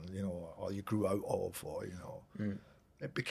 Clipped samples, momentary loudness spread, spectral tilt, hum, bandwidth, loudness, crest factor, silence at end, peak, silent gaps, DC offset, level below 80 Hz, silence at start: under 0.1%; 13 LU; -6 dB/octave; none; 15 kHz; -40 LUFS; 20 dB; 0 s; -20 dBFS; none; under 0.1%; -66 dBFS; 0 s